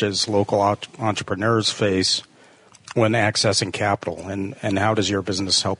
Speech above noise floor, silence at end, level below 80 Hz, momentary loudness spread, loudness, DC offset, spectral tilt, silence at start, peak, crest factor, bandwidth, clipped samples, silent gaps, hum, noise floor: 30 dB; 0.05 s; -60 dBFS; 8 LU; -21 LUFS; under 0.1%; -4 dB/octave; 0 s; -4 dBFS; 16 dB; 11 kHz; under 0.1%; none; none; -51 dBFS